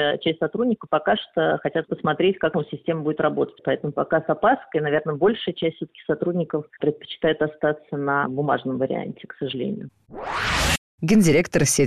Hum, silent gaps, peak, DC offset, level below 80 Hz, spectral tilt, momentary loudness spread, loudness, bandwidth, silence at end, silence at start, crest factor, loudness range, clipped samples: none; 10.78-10.98 s; -8 dBFS; under 0.1%; -44 dBFS; -4.5 dB/octave; 8 LU; -23 LUFS; 13.5 kHz; 0 s; 0 s; 14 dB; 2 LU; under 0.1%